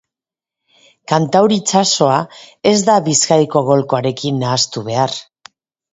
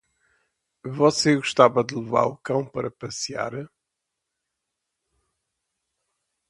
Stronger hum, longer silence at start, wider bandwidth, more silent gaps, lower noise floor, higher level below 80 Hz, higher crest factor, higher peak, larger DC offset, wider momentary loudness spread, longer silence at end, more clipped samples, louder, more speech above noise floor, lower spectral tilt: neither; first, 1.1 s vs 0.85 s; second, 8 kHz vs 11.5 kHz; neither; first, -88 dBFS vs -82 dBFS; first, -58 dBFS vs -64 dBFS; second, 16 dB vs 26 dB; about the same, 0 dBFS vs 0 dBFS; neither; second, 6 LU vs 17 LU; second, 0.7 s vs 2.85 s; neither; first, -14 LUFS vs -23 LUFS; first, 73 dB vs 60 dB; about the same, -4 dB/octave vs -4.5 dB/octave